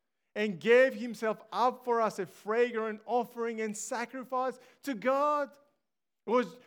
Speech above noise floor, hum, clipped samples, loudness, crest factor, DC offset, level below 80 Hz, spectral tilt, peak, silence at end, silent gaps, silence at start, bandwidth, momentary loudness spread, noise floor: 57 dB; none; under 0.1%; -31 LUFS; 20 dB; under 0.1%; under -90 dBFS; -4 dB/octave; -12 dBFS; 0.1 s; none; 0.35 s; 18 kHz; 12 LU; -88 dBFS